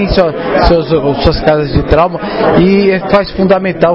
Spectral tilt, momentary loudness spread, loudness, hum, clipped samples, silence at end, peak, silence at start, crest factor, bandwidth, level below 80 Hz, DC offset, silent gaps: -9 dB/octave; 4 LU; -10 LUFS; none; 0.4%; 0 s; 0 dBFS; 0 s; 10 dB; 6.2 kHz; -22 dBFS; 0.8%; none